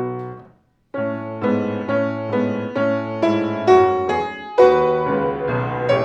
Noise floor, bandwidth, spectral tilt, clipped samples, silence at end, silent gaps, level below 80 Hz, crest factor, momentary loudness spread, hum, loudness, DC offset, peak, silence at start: -53 dBFS; 7.6 kHz; -7.5 dB/octave; under 0.1%; 0 s; none; -54 dBFS; 18 dB; 11 LU; none; -19 LUFS; under 0.1%; 0 dBFS; 0 s